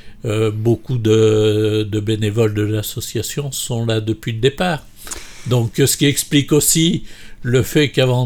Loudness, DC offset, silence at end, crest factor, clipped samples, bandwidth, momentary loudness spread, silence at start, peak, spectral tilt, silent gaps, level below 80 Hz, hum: -17 LUFS; under 0.1%; 0 s; 14 dB; under 0.1%; 19.5 kHz; 10 LU; 0.05 s; -2 dBFS; -5 dB/octave; none; -40 dBFS; none